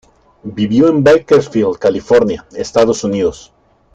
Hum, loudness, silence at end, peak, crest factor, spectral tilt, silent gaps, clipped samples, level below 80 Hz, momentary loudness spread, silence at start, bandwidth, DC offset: none; -13 LUFS; 0.55 s; 0 dBFS; 12 dB; -6 dB/octave; none; under 0.1%; -46 dBFS; 10 LU; 0.45 s; 8.8 kHz; under 0.1%